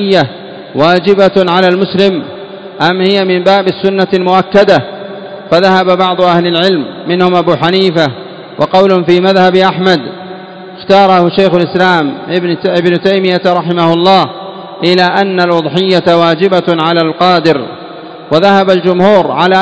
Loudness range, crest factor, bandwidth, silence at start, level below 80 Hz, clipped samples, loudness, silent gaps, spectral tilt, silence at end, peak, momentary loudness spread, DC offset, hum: 1 LU; 10 dB; 8 kHz; 0 s; -52 dBFS; 2%; -9 LUFS; none; -6.5 dB/octave; 0 s; 0 dBFS; 16 LU; 0.3%; none